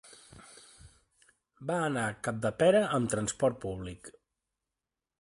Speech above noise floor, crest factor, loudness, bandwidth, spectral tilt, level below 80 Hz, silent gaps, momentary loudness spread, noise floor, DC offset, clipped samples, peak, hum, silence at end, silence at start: 60 dB; 20 dB; -30 LUFS; 11.5 kHz; -5 dB/octave; -60 dBFS; none; 27 LU; -89 dBFS; under 0.1%; under 0.1%; -14 dBFS; none; 1.1 s; 0.05 s